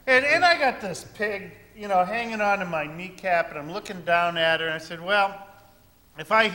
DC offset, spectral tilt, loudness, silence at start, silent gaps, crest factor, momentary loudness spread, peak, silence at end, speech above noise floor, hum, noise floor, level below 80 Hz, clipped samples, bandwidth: under 0.1%; -3.5 dB/octave; -24 LUFS; 0.05 s; none; 20 dB; 16 LU; -6 dBFS; 0 s; 30 dB; none; -56 dBFS; -60 dBFS; under 0.1%; 16.5 kHz